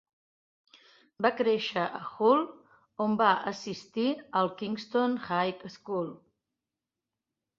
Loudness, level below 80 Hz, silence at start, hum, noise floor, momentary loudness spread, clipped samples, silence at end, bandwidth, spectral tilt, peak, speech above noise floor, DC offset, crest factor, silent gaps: -29 LUFS; -76 dBFS; 1.2 s; none; -89 dBFS; 12 LU; under 0.1%; 1.45 s; 7.4 kHz; -5.5 dB/octave; -8 dBFS; 60 dB; under 0.1%; 22 dB; none